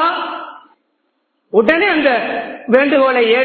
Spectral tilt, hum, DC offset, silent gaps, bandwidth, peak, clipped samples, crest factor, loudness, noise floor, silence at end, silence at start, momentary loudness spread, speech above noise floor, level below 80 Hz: -6.5 dB/octave; none; under 0.1%; none; 4.7 kHz; 0 dBFS; under 0.1%; 16 dB; -14 LUFS; -66 dBFS; 0 s; 0 s; 13 LU; 54 dB; -56 dBFS